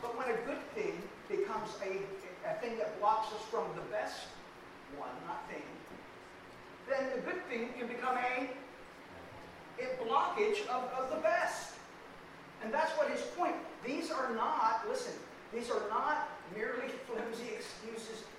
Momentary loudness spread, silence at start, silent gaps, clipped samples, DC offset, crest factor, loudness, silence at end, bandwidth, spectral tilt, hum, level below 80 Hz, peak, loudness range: 18 LU; 0 s; none; under 0.1%; under 0.1%; 20 dB; -37 LUFS; 0 s; 16 kHz; -3.5 dB/octave; none; -70 dBFS; -18 dBFS; 6 LU